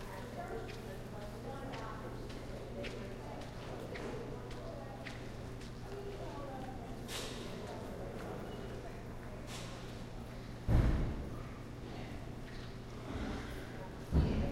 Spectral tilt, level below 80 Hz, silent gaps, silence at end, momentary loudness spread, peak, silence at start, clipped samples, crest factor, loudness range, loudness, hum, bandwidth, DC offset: -6.5 dB/octave; -46 dBFS; none; 0 s; 12 LU; -18 dBFS; 0 s; under 0.1%; 22 dB; 5 LU; -43 LUFS; none; 16 kHz; under 0.1%